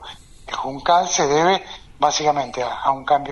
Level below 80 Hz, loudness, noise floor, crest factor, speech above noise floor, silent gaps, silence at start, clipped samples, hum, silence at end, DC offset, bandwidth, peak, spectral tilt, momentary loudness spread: -48 dBFS; -19 LUFS; -39 dBFS; 18 dB; 20 dB; none; 0 s; under 0.1%; none; 0 s; under 0.1%; 11 kHz; -2 dBFS; -2.5 dB/octave; 12 LU